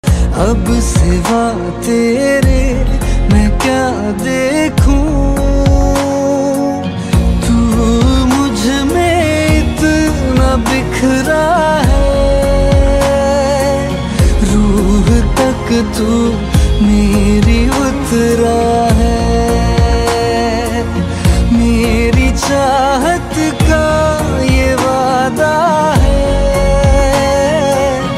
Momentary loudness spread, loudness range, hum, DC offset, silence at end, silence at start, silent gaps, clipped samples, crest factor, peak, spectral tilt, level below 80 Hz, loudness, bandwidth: 3 LU; 1 LU; none; under 0.1%; 0 s; 0.05 s; none; under 0.1%; 10 dB; 0 dBFS; -6 dB/octave; -16 dBFS; -12 LUFS; 15 kHz